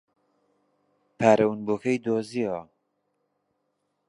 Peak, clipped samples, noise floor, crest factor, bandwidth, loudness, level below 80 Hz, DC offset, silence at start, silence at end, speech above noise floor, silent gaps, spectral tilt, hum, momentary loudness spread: -4 dBFS; under 0.1%; -76 dBFS; 24 dB; 11 kHz; -25 LUFS; -70 dBFS; under 0.1%; 1.2 s; 1.45 s; 52 dB; none; -6.5 dB/octave; 50 Hz at -60 dBFS; 10 LU